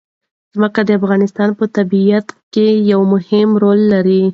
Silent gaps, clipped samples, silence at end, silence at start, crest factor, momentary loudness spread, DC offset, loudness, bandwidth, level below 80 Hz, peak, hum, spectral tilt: 2.43-2.51 s; under 0.1%; 0 s; 0.55 s; 12 dB; 6 LU; under 0.1%; -13 LUFS; 6.8 kHz; -60 dBFS; 0 dBFS; none; -8.5 dB/octave